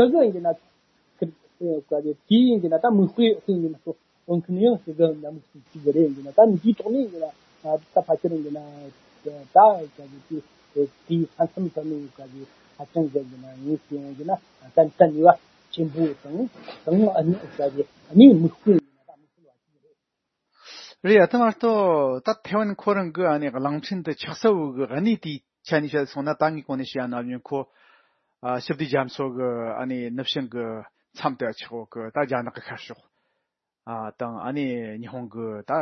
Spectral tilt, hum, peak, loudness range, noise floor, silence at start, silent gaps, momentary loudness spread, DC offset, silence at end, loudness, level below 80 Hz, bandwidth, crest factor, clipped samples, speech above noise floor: -8 dB/octave; none; 0 dBFS; 10 LU; -81 dBFS; 0 s; none; 18 LU; under 0.1%; 0 s; -22 LUFS; -70 dBFS; 6.4 kHz; 22 dB; under 0.1%; 58 dB